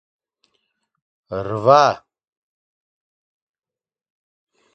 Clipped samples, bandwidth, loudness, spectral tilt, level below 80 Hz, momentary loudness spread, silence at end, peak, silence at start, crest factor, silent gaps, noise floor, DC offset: under 0.1%; 7.8 kHz; -16 LUFS; -5.5 dB/octave; -60 dBFS; 18 LU; 2.75 s; 0 dBFS; 1.3 s; 24 dB; none; -72 dBFS; under 0.1%